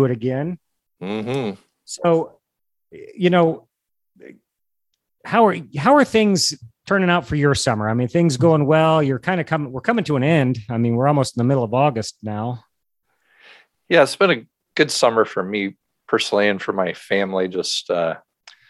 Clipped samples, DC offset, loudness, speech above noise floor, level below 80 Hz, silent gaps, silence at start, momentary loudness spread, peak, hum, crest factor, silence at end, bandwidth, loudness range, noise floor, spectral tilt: under 0.1%; under 0.1%; -19 LUFS; 59 dB; -52 dBFS; none; 0 s; 13 LU; -2 dBFS; none; 18 dB; 0.5 s; 12.5 kHz; 5 LU; -77 dBFS; -5.5 dB/octave